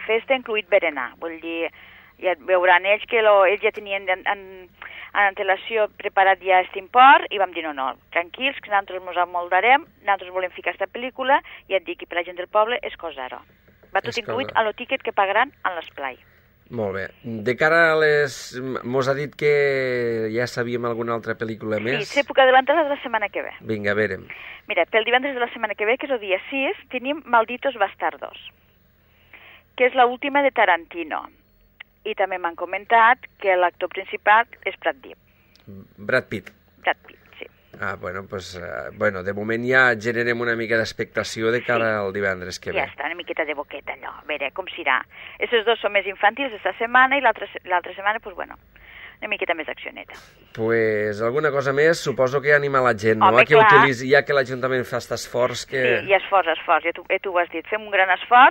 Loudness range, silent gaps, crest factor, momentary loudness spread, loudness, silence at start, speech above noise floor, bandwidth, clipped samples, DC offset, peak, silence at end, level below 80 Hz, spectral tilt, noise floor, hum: 8 LU; none; 22 dB; 15 LU; -21 LUFS; 0 s; 37 dB; 16 kHz; under 0.1%; under 0.1%; 0 dBFS; 0 s; -60 dBFS; -4.5 dB/octave; -58 dBFS; none